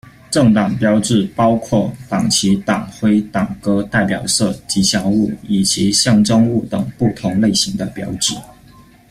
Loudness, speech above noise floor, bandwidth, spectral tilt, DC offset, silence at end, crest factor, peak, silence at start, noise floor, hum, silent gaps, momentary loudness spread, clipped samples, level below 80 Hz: -15 LUFS; 29 dB; 15 kHz; -4.5 dB/octave; under 0.1%; 0.65 s; 14 dB; -2 dBFS; 0.05 s; -44 dBFS; none; none; 7 LU; under 0.1%; -44 dBFS